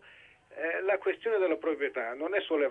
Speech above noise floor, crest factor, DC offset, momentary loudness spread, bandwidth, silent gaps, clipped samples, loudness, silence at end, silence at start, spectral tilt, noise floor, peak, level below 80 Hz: 27 dB; 14 dB; under 0.1%; 6 LU; 4 kHz; none; under 0.1%; -31 LUFS; 0 s; 0.05 s; -5.5 dB/octave; -57 dBFS; -16 dBFS; -76 dBFS